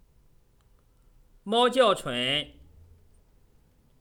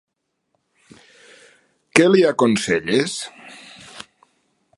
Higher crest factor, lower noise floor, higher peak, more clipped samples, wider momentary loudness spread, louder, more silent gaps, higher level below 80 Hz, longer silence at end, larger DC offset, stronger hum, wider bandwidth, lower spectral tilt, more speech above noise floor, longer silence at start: about the same, 22 dB vs 22 dB; second, -61 dBFS vs -72 dBFS; second, -8 dBFS vs 0 dBFS; neither; second, 17 LU vs 25 LU; second, -24 LUFS vs -17 LUFS; neither; about the same, -58 dBFS vs -60 dBFS; first, 1.5 s vs 0.75 s; neither; neither; first, 17.5 kHz vs 11.5 kHz; about the same, -3.5 dB/octave vs -4.5 dB/octave; second, 37 dB vs 55 dB; second, 1.45 s vs 1.95 s